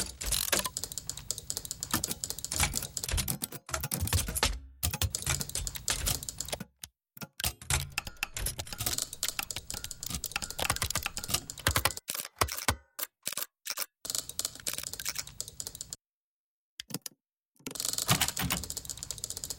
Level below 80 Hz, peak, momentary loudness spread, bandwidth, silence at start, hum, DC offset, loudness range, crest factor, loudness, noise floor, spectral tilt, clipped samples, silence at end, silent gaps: -46 dBFS; -8 dBFS; 11 LU; 17 kHz; 0 s; none; under 0.1%; 5 LU; 26 dB; -33 LUFS; under -90 dBFS; -2 dB/octave; under 0.1%; 0 s; 16.01-16.05 s, 16.13-16.77 s, 17.45-17.52 s